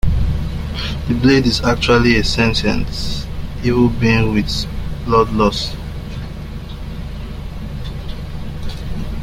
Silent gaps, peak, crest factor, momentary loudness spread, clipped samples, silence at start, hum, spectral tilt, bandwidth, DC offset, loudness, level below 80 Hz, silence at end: none; -2 dBFS; 16 dB; 16 LU; under 0.1%; 0.05 s; none; -6 dB/octave; 16 kHz; under 0.1%; -17 LUFS; -26 dBFS; 0 s